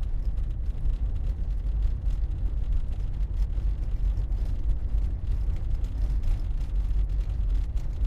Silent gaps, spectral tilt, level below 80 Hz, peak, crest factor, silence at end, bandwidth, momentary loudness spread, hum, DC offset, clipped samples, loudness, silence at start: none; -8.5 dB/octave; -26 dBFS; -14 dBFS; 12 dB; 0 s; 4.1 kHz; 2 LU; none; under 0.1%; under 0.1%; -31 LUFS; 0 s